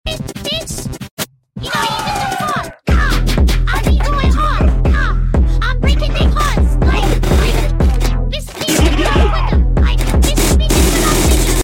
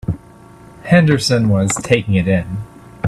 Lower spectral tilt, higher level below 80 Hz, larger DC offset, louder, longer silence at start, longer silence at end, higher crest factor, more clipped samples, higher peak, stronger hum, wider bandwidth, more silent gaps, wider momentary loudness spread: about the same, -4.5 dB/octave vs -5.5 dB/octave; first, -14 dBFS vs -42 dBFS; neither; about the same, -15 LUFS vs -15 LUFS; about the same, 0.05 s vs 0.05 s; about the same, 0 s vs 0 s; about the same, 12 dB vs 16 dB; neither; about the same, 0 dBFS vs 0 dBFS; neither; first, 17 kHz vs 13 kHz; first, 1.11-1.17 s vs none; second, 8 LU vs 16 LU